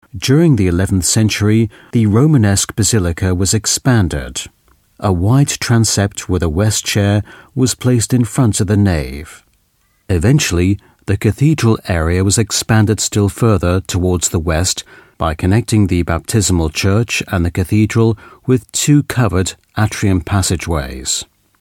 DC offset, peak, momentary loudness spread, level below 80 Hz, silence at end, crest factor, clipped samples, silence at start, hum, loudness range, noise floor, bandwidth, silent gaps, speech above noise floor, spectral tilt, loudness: under 0.1%; 0 dBFS; 7 LU; -32 dBFS; 0.35 s; 14 dB; under 0.1%; 0.15 s; none; 3 LU; -59 dBFS; 16.5 kHz; none; 45 dB; -5 dB/octave; -14 LUFS